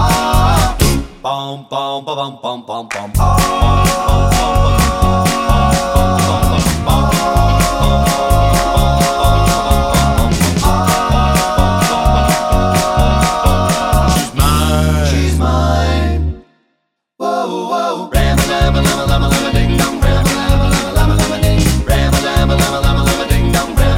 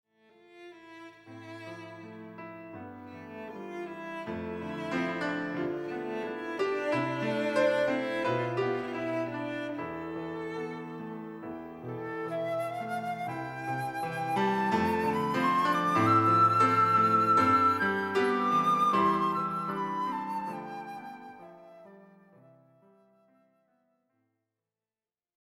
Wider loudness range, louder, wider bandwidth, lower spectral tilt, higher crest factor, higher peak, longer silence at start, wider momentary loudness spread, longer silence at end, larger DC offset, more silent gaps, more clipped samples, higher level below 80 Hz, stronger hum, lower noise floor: second, 4 LU vs 18 LU; first, -13 LUFS vs -29 LUFS; about the same, 17 kHz vs 16 kHz; about the same, -5 dB/octave vs -6 dB/octave; second, 12 dB vs 18 dB; first, 0 dBFS vs -14 dBFS; second, 0 s vs 0.55 s; second, 7 LU vs 21 LU; second, 0 s vs 3.45 s; neither; neither; neither; first, -16 dBFS vs -70 dBFS; neither; second, -68 dBFS vs under -90 dBFS